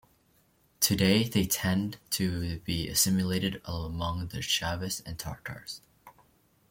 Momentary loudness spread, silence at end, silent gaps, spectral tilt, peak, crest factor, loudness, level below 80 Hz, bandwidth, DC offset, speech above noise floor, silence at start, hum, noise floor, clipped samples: 14 LU; 0.6 s; none; -4 dB/octave; -8 dBFS; 24 dB; -29 LUFS; -52 dBFS; 17 kHz; under 0.1%; 37 dB; 0.8 s; none; -67 dBFS; under 0.1%